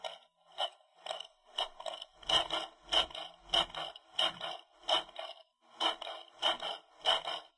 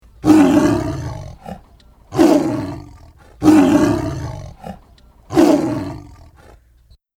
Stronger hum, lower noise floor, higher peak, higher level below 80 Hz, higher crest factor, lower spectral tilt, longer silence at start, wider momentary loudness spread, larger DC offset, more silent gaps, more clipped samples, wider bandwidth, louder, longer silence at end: neither; first, -57 dBFS vs -51 dBFS; second, -16 dBFS vs 0 dBFS; second, -66 dBFS vs -40 dBFS; first, 22 dB vs 16 dB; second, -1 dB/octave vs -6.5 dB/octave; second, 0 s vs 0.25 s; second, 14 LU vs 23 LU; neither; neither; neither; second, 11.5 kHz vs 16 kHz; second, -35 LUFS vs -15 LUFS; second, 0.1 s vs 1.1 s